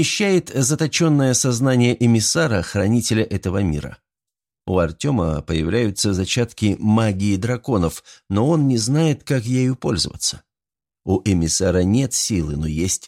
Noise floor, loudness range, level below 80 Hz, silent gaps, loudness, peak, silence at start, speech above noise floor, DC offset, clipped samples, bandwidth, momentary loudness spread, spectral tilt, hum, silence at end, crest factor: under -90 dBFS; 4 LU; -40 dBFS; none; -19 LUFS; -6 dBFS; 0 s; over 71 dB; under 0.1%; under 0.1%; 16 kHz; 7 LU; -5 dB/octave; none; 0 s; 14 dB